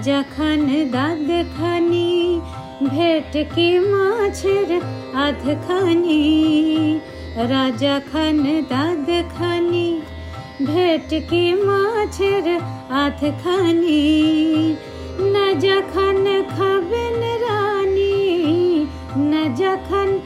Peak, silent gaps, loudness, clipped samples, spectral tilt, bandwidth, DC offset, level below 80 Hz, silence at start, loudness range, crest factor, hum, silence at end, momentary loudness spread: -6 dBFS; none; -18 LUFS; under 0.1%; -6 dB/octave; 12.5 kHz; under 0.1%; -42 dBFS; 0 s; 2 LU; 12 dB; none; 0 s; 7 LU